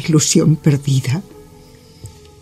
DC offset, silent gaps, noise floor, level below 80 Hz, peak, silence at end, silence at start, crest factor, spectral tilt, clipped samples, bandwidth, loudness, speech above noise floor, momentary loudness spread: under 0.1%; none; -43 dBFS; -48 dBFS; 0 dBFS; 0.35 s; 0 s; 16 dB; -5 dB/octave; under 0.1%; 15 kHz; -15 LUFS; 28 dB; 10 LU